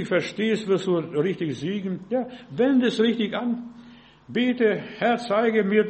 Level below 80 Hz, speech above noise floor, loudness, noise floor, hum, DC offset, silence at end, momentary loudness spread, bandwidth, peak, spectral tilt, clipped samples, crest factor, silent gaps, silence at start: -66 dBFS; 25 dB; -24 LUFS; -48 dBFS; none; under 0.1%; 0 s; 9 LU; 8.4 kHz; -6 dBFS; -6.5 dB/octave; under 0.1%; 16 dB; none; 0 s